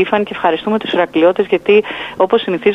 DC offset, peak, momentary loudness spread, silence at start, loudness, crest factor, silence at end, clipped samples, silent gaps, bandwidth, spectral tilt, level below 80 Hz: under 0.1%; 0 dBFS; 5 LU; 0 s; -14 LUFS; 14 dB; 0 s; under 0.1%; none; 6.4 kHz; -6.5 dB/octave; -54 dBFS